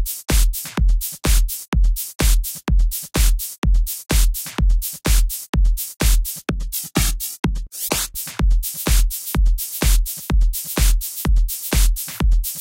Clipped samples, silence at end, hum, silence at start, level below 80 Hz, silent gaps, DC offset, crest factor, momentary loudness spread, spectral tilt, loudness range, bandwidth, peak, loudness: under 0.1%; 0 s; none; 0 s; -18 dBFS; 1.68-1.72 s, 2.15-2.19 s, 3.58-3.62 s, 5.49-5.53 s, 7.39-7.43 s; 0.1%; 12 dB; 3 LU; -3.5 dB/octave; 1 LU; 17 kHz; -4 dBFS; -21 LUFS